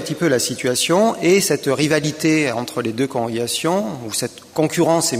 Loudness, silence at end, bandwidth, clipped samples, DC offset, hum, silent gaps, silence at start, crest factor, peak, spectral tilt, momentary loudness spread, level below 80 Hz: -18 LUFS; 0 s; 15.5 kHz; under 0.1%; under 0.1%; none; none; 0 s; 18 dB; -2 dBFS; -4 dB/octave; 8 LU; -60 dBFS